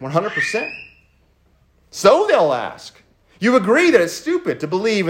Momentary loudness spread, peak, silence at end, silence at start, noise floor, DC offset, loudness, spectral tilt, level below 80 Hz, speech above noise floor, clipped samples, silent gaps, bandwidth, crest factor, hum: 16 LU; 0 dBFS; 0 s; 0 s; -57 dBFS; under 0.1%; -17 LUFS; -4.5 dB/octave; -60 dBFS; 40 dB; under 0.1%; none; 16 kHz; 18 dB; none